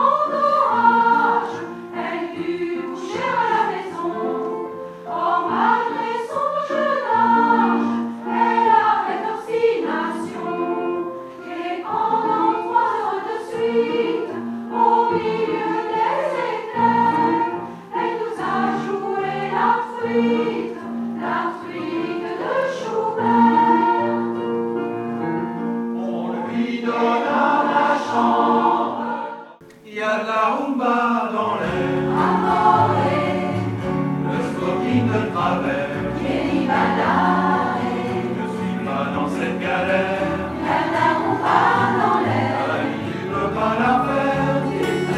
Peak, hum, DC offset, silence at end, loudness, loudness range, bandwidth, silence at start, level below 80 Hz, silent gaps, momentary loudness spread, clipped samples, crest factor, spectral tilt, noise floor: -2 dBFS; none; under 0.1%; 0 s; -20 LUFS; 3 LU; 12.5 kHz; 0 s; -54 dBFS; none; 10 LU; under 0.1%; 18 dB; -6.5 dB/octave; -42 dBFS